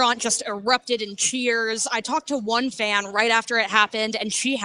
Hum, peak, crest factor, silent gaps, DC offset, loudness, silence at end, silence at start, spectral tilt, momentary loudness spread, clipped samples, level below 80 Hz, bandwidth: none; -4 dBFS; 20 dB; none; under 0.1%; -22 LUFS; 0 s; 0 s; -1 dB/octave; 5 LU; under 0.1%; -66 dBFS; 14.5 kHz